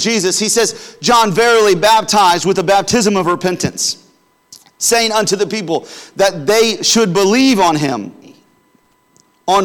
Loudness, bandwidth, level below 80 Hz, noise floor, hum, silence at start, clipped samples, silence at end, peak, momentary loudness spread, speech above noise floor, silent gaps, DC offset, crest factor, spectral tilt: -13 LUFS; 19 kHz; -50 dBFS; -55 dBFS; none; 0 s; under 0.1%; 0 s; -4 dBFS; 9 LU; 42 dB; none; under 0.1%; 10 dB; -3 dB/octave